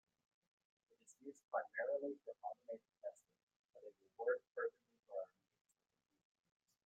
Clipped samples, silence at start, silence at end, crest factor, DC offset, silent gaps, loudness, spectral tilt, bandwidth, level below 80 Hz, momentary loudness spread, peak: under 0.1%; 1.1 s; 1.6 s; 22 dB; under 0.1%; 1.44-1.48 s, 3.43-3.47 s, 3.56-3.69 s, 4.47-4.55 s; -47 LUFS; -4.5 dB/octave; 8.4 kHz; under -90 dBFS; 17 LU; -28 dBFS